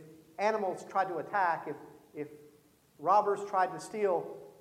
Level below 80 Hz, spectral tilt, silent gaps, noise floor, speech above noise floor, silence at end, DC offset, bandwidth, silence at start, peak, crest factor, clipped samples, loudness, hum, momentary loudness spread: -80 dBFS; -5 dB/octave; none; -64 dBFS; 32 dB; 0.1 s; under 0.1%; 16 kHz; 0 s; -14 dBFS; 20 dB; under 0.1%; -32 LUFS; none; 18 LU